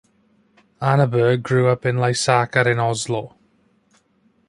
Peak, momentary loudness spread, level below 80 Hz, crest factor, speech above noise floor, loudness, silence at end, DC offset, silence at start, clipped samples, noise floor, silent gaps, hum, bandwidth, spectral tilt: -2 dBFS; 8 LU; -58 dBFS; 20 dB; 43 dB; -19 LUFS; 1.2 s; under 0.1%; 0.8 s; under 0.1%; -61 dBFS; none; none; 11.5 kHz; -5.5 dB/octave